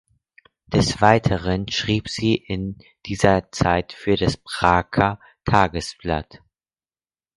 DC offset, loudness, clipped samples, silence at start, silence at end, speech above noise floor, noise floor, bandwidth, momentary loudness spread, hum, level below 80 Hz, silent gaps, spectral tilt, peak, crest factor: under 0.1%; -21 LUFS; under 0.1%; 0.7 s; 1.15 s; over 70 dB; under -90 dBFS; 11.5 kHz; 11 LU; none; -40 dBFS; none; -5.5 dB/octave; 0 dBFS; 22 dB